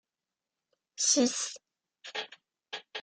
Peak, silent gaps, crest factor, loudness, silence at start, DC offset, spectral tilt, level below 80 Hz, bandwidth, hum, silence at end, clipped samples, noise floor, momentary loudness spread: -12 dBFS; none; 22 dB; -30 LUFS; 1 s; under 0.1%; -0.5 dB/octave; -82 dBFS; 11 kHz; none; 0 s; under 0.1%; under -90 dBFS; 24 LU